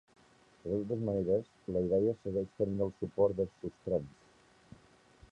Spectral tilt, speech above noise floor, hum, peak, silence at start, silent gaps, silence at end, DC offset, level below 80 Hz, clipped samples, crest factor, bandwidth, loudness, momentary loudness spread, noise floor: -10 dB/octave; 31 dB; none; -18 dBFS; 0.65 s; none; 1.2 s; under 0.1%; -60 dBFS; under 0.1%; 18 dB; 8.2 kHz; -34 LUFS; 7 LU; -64 dBFS